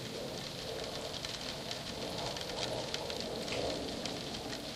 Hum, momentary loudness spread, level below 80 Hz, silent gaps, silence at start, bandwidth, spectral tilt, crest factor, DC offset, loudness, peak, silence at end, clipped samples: none; 4 LU; -58 dBFS; none; 0 s; 15.5 kHz; -3.5 dB/octave; 22 dB; under 0.1%; -39 LUFS; -18 dBFS; 0 s; under 0.1%